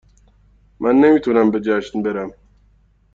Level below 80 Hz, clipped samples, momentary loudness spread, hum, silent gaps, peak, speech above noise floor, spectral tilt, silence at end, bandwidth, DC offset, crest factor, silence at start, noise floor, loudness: -52 dBFS; under 0.1%; 12 LU; none; none; -2 dBFS; 39 dB; -7.5 dB/octave; 0.85 s; 7.4 kHz; under 0.1%; 16 dB; 0.8 s; -55 dBFS; -17 LUFS